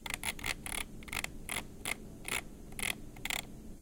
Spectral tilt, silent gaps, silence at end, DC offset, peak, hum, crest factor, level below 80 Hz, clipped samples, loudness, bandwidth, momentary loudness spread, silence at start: -1.5 dB/octave; none; 0 s; under 0.1%; -14 dBFS; none; 26 dB; -50 dBFS; under 0.1%; -38 LUFS; 17 kHz; 3 LU; 0 s